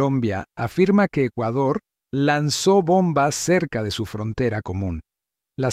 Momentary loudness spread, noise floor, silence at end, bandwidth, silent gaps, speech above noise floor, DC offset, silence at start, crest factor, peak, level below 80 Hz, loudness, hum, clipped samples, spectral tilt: 10 LU; -86 dBFS; 0 s; 16 kHz; none; 66 dB; under 0.1%; 0 s; 16 dB; -6 dBFS; -50 dBFS; -21 LUFS; none; under 0.1%; -5.5 dB/octave